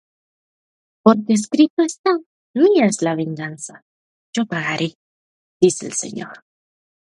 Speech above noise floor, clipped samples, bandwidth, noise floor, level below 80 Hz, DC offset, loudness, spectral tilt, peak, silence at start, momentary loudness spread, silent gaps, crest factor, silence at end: over 72 dB; under 0.1%; 11.5 kHz; under -90 dBFS; -68 dBFS; under 0.1%; -19 LUFS; -5 dB/octave; -2 dBFS; 1.05 s; 14 LU; 1.70-1.77 s, 1.99-2.04 s, 2.26-2.54 s, 3.82-4.33 s, 4.95-5.60 s; 20 dB; 0.75 s